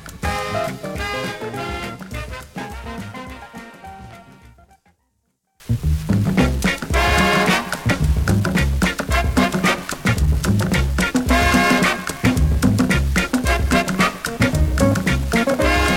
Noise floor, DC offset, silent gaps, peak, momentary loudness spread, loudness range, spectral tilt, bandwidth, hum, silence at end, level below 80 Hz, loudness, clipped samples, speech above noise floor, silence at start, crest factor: -69 dBFS; under 0.1%; none; -2 dBFS; 16 LU; 14 LU; -5 dB/octave; 17 kHz; none; 0 s; -26 dBFS; -19 LUFS; under 0.1%; 44 dB; 0 s; 18 dB